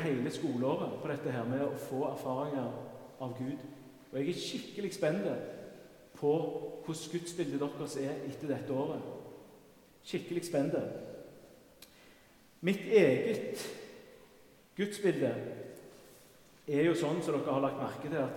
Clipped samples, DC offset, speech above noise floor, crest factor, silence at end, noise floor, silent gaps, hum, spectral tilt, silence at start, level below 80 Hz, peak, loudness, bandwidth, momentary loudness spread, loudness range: under 0.1%; under 0.1%; 28 dB; 22 dB; 0 s; -62 dBFS; none; none; -6 dB/octave; 0 s; -74 dBFS; -14 dBFS; -35 LUFS; 18 kHz; 19 LU; 6 LU